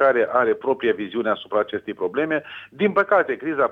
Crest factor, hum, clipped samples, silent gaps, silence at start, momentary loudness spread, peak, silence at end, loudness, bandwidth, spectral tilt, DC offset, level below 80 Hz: 16 dB; none; under 0.1%; none; 0 s; 8 LU; -4 dBFS; 0 s; -22 LUFS; 4.7 kHz; -7.5 dB/octave; under 0.1%; -66 dBFS